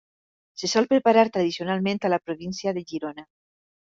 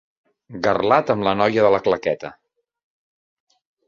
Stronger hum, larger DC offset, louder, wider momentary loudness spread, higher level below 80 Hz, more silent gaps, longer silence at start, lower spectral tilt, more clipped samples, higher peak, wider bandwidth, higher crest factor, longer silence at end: neither; neither; second, -24 LUFS vs -19 LUFS; about the same, 14 LU vs 12 LU; second, -68 dBFS vs -56 dBFS; neither; about the same, 0.6 s vs 0.5 s; second, -5 dB/octave vs -6.5 dB/octave; neither; second, -6 dBFS vs -2 dBFS; about the same, 7.8 kHz vs 7.2 kHz; about the same, 20 dB vs 20 dB; second, 0.7 s vs 1.55 s